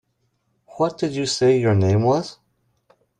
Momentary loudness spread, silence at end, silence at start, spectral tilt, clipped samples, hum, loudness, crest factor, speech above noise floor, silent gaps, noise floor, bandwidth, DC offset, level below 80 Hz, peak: 7 LU; 0.85 s; 0.75 s; -6 dB/octave; under 0.1%; none; -20 LUFS; 14 dB; 51 dB; none; -69 dBFS; 10.5 kHz; under 0.1%; -60 dBFS; -6 dBFS